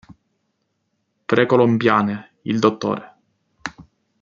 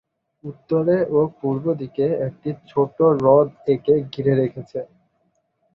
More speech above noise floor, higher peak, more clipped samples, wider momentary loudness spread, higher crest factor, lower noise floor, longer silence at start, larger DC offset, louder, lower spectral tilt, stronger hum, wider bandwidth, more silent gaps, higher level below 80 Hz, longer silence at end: first, 54 dB vs 48 dB; about the same, -2 dBFS vs -2 dBFS; neither; about the same, 18 LU vs 16 LU; about the same, 20 dB vs 18 dB; first, -72 dBFS vs -68 dBFS; first, 1.3 s vs 0.45 s; neither; about the same, -19 LUFS vs -20 LUFS; second, -6.5 dB/octave vs -10 dB/octave; neither; first, 7.4 kHz vs 5.8 kHz; neither; about the same, -62 dBFS vs -58 dBFS; second, 0.4 s vs 0.9 s